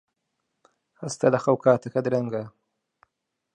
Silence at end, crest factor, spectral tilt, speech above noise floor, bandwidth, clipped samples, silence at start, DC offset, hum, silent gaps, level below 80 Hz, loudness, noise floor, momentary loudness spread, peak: 1.05 s; 22 dB; -6.5 dB/octave; 57 dB; 11 kHz; under 0.1%; 1 s; under 0.1%; none; none; -70 dBFS; -24 LUFS; -80 dBFS; 15 LU; -6 dBFS